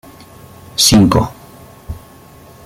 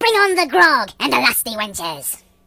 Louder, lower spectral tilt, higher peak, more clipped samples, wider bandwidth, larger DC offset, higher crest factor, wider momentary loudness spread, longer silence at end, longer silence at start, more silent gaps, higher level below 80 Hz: first, -11 LUFS vs -16 LUFS; first, -4 dB/octave vs -1.5 dB/octave; about the same, 0 dBFS vs 0 dBFS; neither; about the same, 16.5 kHz vs 17 kHz; neither; about the same, 16 dB vs 18 dB; first, 24 LU vs 11 LU; first, 0.65 s vs 0.3 s; first, 0.8 s vs 0 s; neither; first, -34 dBFS vs -54 dBFS